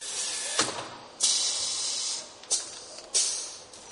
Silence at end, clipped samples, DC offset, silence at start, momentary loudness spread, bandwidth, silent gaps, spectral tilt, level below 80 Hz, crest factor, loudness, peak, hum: 0 s; under 0.1%; under 0.1%; 0 s; 14 LU; 14.5 kHz; none; 1 dB/octave; -70 dBFS; 22 dB; -27 LUFS; -10 dBFS; none